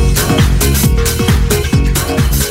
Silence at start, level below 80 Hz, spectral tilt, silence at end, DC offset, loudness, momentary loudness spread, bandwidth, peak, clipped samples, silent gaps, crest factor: 0 s; -14 dBFS; -4.5 dB/octave; 0 s; under 0.1%; -12 LUFS; 2 LU; 16.5 kHz; 0 dBFS; under 0.1%; none; 10 dB